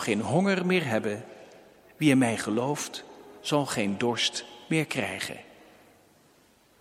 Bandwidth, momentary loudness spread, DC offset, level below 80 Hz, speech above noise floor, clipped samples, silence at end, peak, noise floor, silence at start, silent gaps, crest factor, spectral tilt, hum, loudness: 16 kHz; 14 LU; under 0.1%; -70 dBFS; 34 dB; under 0.1%; 1.4 s; -8 dBFS; -61 dBFS; 0 s; none; 20 dB; -4.5 dB/octave; none; -27 LUFS